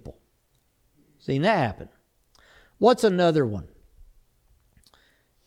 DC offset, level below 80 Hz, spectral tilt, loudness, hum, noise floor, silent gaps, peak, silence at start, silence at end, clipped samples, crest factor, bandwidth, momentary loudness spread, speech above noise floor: under 0.1%; -56 dBFS; -6.5 dB/octave; -23 LUFS; none; -68 dBFS; none; -6 dBFS; 0.05 s; 1.8 s; under 0.1%; 20 dB; 15 kHz; 21 LU; 46 dB